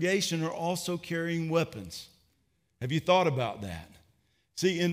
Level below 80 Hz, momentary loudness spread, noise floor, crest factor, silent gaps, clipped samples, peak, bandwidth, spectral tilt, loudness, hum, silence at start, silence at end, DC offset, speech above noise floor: -64 dBFS; 17 LU; -74 dBFS; 20 dB; none; under 0.1%; -10 dBFS; 16 kHz; -5 dB/octave; -30 LUFS; none; 0 s; 0 s; under 0.1%; 44 dB